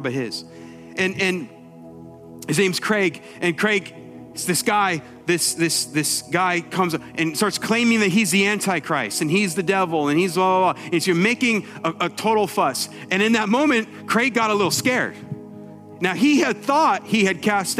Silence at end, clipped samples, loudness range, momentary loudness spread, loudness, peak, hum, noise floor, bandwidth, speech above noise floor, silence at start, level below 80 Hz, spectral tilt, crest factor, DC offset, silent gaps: 0 s; under 0.1%; 3 LU; 11 LU; -20 LUFS; -2 dBFS; none; -41 dBFS; 16 kHz; 20 dB; 0 s; -66 dBFS; -4 dB/octave; 18 dB; under 0.1%; none